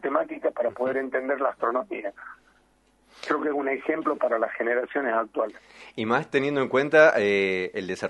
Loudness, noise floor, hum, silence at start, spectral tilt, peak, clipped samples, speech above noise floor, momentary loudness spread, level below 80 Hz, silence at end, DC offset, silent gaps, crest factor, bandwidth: -25 LUFS; -63 dBFS; none; 0.05 s; -5.5 dB/octave; -4 dBFS; under 0.1%; 38 dB; 14 LU; -70 dBFS; 0 s; under 0.1%; none; 22 dB; 10.5 kHz